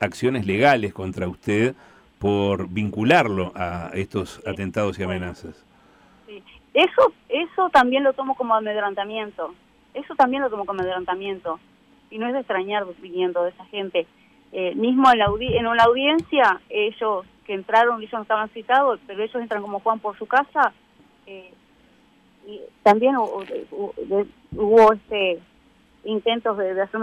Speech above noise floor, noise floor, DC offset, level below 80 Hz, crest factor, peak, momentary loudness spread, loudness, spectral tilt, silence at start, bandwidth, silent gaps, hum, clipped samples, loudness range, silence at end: 35 dB; -56 dBFS; under 0.1%; -54 dBFS; 16 dB; -6 dBFS; 15 LU; -21 LUFS; -6 dB/octave; 0 s; 13 kHz; none; none; under 0.1%; 7 LU; 0 s